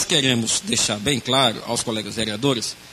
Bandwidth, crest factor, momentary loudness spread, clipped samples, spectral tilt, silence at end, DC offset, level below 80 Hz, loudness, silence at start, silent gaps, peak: 14 kHz; 20 dB; 7 LU; under 0.1%; -2.5 dB/octave; 0 s; under 0.1%; -52 dBFS; -20 LUFS; 0 s; none; -2 dBFS